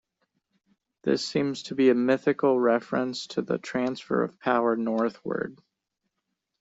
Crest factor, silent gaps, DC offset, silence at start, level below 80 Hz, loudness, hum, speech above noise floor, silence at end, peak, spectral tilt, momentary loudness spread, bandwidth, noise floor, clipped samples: 18 dB; none; under 0.1%; 1.05 s; -70 dBFS; -26 LUFS; none; 56 dB; 1.05 s; -8 dBFS; -5.5 dB/octave; 10 LU; 8 kHz; -82 dBFS; under 0.1%